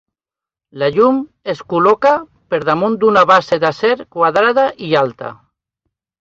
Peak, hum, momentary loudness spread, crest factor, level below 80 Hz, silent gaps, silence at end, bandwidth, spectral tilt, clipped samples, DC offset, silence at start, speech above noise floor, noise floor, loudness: 0 dBFS; none; 10 LU; 14 dB; -56 dBFS; none; 0.85 s; 7.6 kHz; -6 dB/octave; under 0.1%; under 0.1%; 0.75 s; 75 dB; -89 dBFS; -14 LUFS